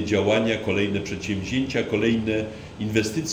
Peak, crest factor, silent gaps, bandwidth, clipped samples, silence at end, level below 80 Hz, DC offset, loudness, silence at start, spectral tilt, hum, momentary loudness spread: -8 dBFS; 16 dB; none; over 20 kHz; under 0.1%; 0 s; -48 dBFS; under 0.1%; -24 LUFS; 0 s; -5 dB/octave; none; 7 LU